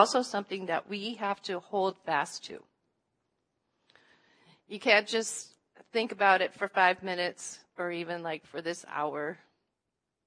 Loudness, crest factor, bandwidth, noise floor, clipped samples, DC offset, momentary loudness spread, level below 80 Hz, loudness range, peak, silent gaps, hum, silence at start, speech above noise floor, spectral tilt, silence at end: -30 LUFS; 26 dB; 11 kHz; -85 dBFS; under 0.1%; under 0.1%; 16 LU; -86 dBFS; 8 LU; -8 dBFS; none; none; 0 s; 55 dB; -2.5 dB/octave; 0.9 s